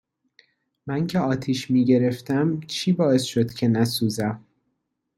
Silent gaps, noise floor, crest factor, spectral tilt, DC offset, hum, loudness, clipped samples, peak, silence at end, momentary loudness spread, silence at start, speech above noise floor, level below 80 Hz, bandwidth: none; -76 dBFS; 16 dB; -6 dB/octave; under 0.1%; none; -23 LUFS; under 0.1%; -8 dBFS; 0.8 s; 8 LU; 0.85 s; 54 dB; -60 dBFS; 14 kHz